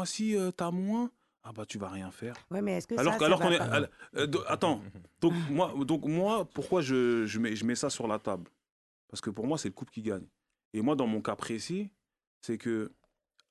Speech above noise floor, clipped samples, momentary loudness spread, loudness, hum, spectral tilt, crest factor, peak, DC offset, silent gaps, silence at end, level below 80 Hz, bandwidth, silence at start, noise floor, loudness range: 41 dB; under 0.1%; 13 LU; -32 LUFS; none; -5 dB/octave; 22 dB; -10 dBFS; under 0.1%; 8.72-9.08 s, 10.65-10.71 s, 12.27-12.41 s; 0.6 s; -66 dBFS; 12.5 kHz; 0 s; -73 dBFS; 6 LU